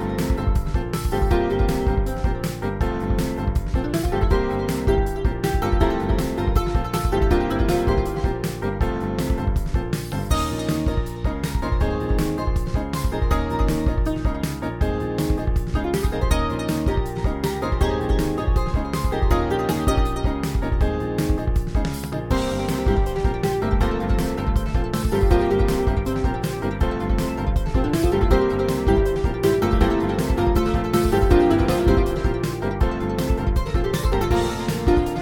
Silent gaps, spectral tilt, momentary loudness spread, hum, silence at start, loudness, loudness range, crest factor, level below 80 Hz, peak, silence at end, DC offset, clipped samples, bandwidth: none; -6.5 dB/octave; 6 LU; none; 0 s; -22 LUFS; 4 LU; 16 dB; -24 dBFS; -4 dBFS; 0 s; under 0.1%; under 0.1%; 18.5 kHz